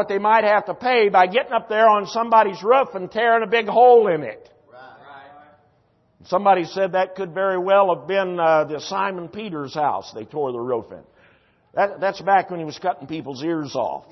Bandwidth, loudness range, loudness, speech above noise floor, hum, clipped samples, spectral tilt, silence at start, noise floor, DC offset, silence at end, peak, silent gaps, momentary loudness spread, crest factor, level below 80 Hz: 6.2 kHz; 7 LU; -19 LUFS; 42 dB; none; under 0.1%; -5.5 dB/octave; 0 s; -62 dBFS; under 0.1%; 0.15 s; -4 dBFS; none; 12 LU; 16 dB; -68 dBFS